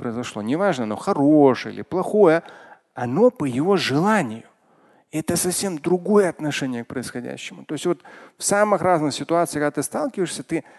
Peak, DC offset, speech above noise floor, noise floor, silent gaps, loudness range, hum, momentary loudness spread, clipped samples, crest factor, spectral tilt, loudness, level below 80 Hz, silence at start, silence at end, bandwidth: -2 dBFS; under 0.1%; 36 dB; -57 dBFS; none; 4 LU; none; 13 LU; under 0.1%; 18 dB; -5 dB/octave; -21 LUFS; -60 dBFS; 0 s; 0.15 s; 12.5 kHz